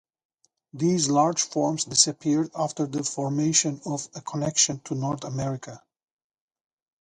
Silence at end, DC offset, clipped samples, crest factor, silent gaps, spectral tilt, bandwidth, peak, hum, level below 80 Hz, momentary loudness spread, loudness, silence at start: 1.25 s; under 0.1%; under 0.1%; 22 dB; none; -3.5 dB/octave; 11.5 kHz; -4 dBFS; none; -64 dBFS; 11 LU; -24 LUFS; 0.75 s